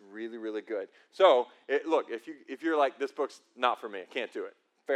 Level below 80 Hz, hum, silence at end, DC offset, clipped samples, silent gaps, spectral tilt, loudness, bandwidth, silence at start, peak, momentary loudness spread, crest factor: under -90 dBFS; none; 0 s; under 0.1%; under 0.1%; none; -3.5 dB/octave; -30 LUFS; 10.5 kHz; 0.1 s; -10 dBFS; 18 LU; 22 dB